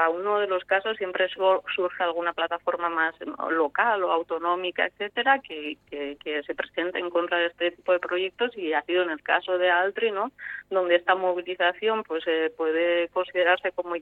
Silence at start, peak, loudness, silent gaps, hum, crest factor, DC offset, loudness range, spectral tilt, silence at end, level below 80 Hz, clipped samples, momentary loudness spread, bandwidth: 0 s; -8 dBFS; -26 LUFS; none; 50 Hz at -70 dBFS; 18 dB; under 0.1%; 3 LU; -5.5 dB/octave; 0 s; -70 dBFS; under 0.1%; 8 LU; 4.2 kHz